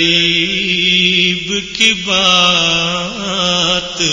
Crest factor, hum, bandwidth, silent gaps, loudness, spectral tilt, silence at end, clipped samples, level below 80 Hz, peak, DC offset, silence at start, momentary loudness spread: 14 dB; none; 11 kHz; none; -11 LUFS; -2 dB/octave; 0 s; under 0.1%; -42 dBFS; 0 dBFS; under 0.1%; 0 s; 8 LU